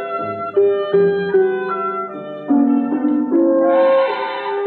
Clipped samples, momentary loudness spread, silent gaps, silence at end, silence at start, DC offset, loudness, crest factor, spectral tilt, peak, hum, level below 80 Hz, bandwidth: under 0.1%; 9 LU; none; 0 s; 0 s; under 0.1%; -17 LUFS; 10 dB; -9.5 dB/octave; -6 dBFS; none; -70 dBFS; 4.4 kHz